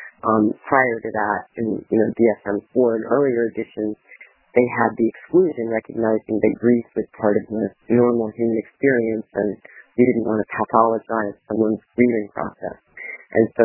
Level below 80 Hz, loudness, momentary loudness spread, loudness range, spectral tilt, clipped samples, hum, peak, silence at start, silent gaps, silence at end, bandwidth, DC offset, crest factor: -60 dBFS; -20 LUFS; 10 LU; 1 LU; -12.5 dB/octave; under 0.1%; none; 0 dBFS; 0 s; none; 0 s; 3.1 kHz; under 0.1%; 20 dB